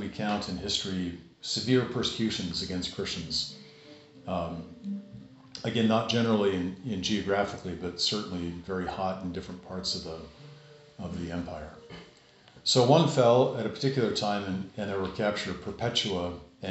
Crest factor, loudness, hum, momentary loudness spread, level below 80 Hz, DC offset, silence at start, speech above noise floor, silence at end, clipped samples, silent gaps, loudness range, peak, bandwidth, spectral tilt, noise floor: 22 dB; -29 LUFS; none; 16 LU; -56 dBFS; under 0.1%; 0 s; 27 dB; 0 s; under 0.1%; none; 9 LU; -8 dBFS; 8 kHz; -4 dB/octave; -57 dBFS